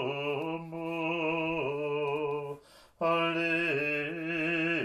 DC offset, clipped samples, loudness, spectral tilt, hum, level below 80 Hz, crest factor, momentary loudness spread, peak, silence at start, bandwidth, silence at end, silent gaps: under 0.1%; under 0.1%; -31 LUFS; -6.5 dB/octave; none; -68 dBFS; 14 dB; 9 LU; -18 dBFS; 0 s; 13 kHz; 0 s; none